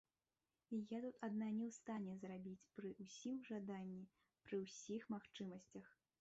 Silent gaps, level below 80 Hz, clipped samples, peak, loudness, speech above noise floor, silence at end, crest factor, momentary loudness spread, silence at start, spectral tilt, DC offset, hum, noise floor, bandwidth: none; -88 dBFS; under 0.1%; -34 dBFS; -51 LUFS; over 40 dB; 0.3 s; 16 dB; 11 LU; 0.7 s; -6.5 dB/octave; under 0.1%; none; under -90 dBFS; 8 kHz